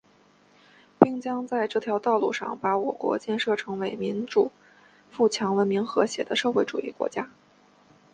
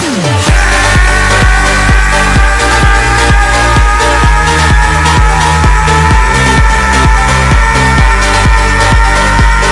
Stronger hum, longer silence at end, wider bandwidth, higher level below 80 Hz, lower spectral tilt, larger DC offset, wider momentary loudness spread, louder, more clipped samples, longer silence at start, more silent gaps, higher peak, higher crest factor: first, 50 Hz at -55 dBFS vs none; first, 0.85 s vs 0 s; second, 9.8 kHz vs 12 kHz; second, -70 dBFS vs -10 dBFS; about the same, -5 dB/octave vs -4 dB/octave; neither; first, 8 LU vs 1 LU; second, -26 LUFS vs -7 LUFS; neither; first, 1 s vs 0 s; neither; about the same, 0 dBFS vs 0 dBFS; first, 26 dB vs 6 dB